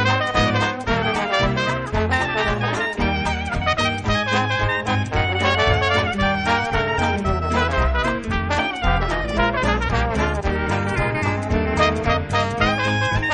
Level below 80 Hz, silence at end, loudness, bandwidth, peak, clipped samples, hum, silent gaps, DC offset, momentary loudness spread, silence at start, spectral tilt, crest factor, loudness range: -30 dBFS; 0 s; -20 LUFS; 10 kHz; -2 dBFS; under 0.1%; none; none; under 0.1%; 4 LU; 0 s; -5.5 dB/octave; 18 dB; 1 LU